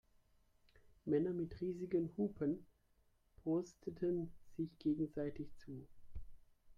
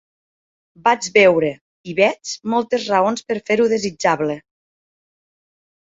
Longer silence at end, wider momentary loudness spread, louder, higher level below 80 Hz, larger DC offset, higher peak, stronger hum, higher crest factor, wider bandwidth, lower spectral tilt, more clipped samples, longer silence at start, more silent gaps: second, 0.05 s vs 1.55 s; first, 16 LU vs 12 LU; second, -42 LUFS vs -18 LUFS; about the same, -64 dBFS vs -62 dBFS; neither; second, -26 dBFS vs -2 dBFS; neither; about the same, 16 dB vs 18 dB; about the same, 7.4 kHz vs 8 kHz; first, -9 dB/octave vs -4 dB/octave; neither; first, 1.05 s vs 0.85 s; second, none vs 1.61-1.84 s